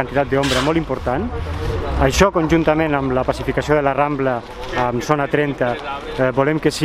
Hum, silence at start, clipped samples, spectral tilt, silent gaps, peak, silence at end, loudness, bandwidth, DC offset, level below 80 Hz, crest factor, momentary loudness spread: none; 0 s; under 0.1%; -5.5 dB/octave; none; 0 dBFS; 0 s; -18 LUFS; 15.5 kHz; under 0.1%; -32 dBFS; 18 dB; 8 LU